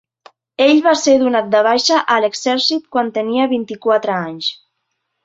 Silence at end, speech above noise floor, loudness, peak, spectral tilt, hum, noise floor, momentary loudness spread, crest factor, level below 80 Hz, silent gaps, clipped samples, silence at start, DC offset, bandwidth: 0.7 s; 58 dB; -15 LUFS; -2 dBFS; -3 dB/octave; none; -72 dBFS; 8 LU; 14 dB; -62 dBFS; none; under 0.1%; 0.6 s; under 0.1%; 8 kHz